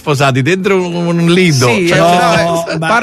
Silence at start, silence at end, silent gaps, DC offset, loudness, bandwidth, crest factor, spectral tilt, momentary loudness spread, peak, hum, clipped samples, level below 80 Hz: 0.05 s; 0 s; none; under 0.1%; -10 LUFS; 13.5 kHz; 10 dB; -5 dB/octave; 5 LU; 0 dBFS; none; under 0.1%; -44 dBFS